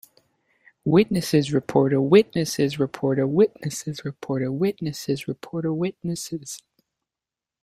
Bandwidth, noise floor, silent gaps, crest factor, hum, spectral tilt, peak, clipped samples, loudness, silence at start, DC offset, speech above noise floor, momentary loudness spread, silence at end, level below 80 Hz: 15.5 kHz; -89 dBFS; none; 20 dB; none; -6 dB/octave; -2 dBFS; under 0.1%; -23 LUFS; 0.85 s; under 0.1%; 67 dB; 13 LU; 1.05 s; -60 dBFS